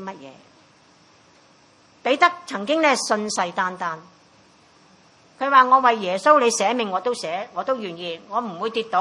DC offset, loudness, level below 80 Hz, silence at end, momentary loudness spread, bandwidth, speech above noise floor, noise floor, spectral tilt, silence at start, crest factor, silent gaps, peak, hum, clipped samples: under 0.1%; -21 LUFS; -78 dBFS; 0 s; 14 LU; 11.5 kHz; 34 dB; -55 dBFS; -2.5 dB/octave; 0 s; 20 dB; none; -2 dBFS; none; under 0.1%